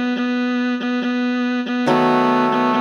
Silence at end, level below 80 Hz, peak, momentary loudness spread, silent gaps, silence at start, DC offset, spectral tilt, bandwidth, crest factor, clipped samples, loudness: 0 s; -72 dBFS; -4 dBFS; 5 LU; none; 0 s; under 0.1%; -6 dB/octave; 6.8 kHz; 14 dB; under 0.1%; -18 LUFS